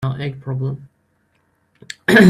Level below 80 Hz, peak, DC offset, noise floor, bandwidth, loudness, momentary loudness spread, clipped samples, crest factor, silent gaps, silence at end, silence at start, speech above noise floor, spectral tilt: -56 dBFS; 0 dBFS; under 0.1%; -63 dBFS; 13.5 kHz; -22 LUFS; 15 LU; under 0.1%; 18 dB; none; 0 s; 0 s; 48 dB; -6.5 dB/octave